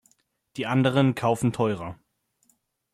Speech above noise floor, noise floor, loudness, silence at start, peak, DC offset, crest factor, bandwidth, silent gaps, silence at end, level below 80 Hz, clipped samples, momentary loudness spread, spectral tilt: 45 dB; -68 dBFS; -24 LUFS; 0.55 s; -8 dBFS; under 0.1%; 18 dB; 13.5 kHz; none; 1 s; -62 dBFS; under 0.1%; 15 LU; -6.5 dB/octave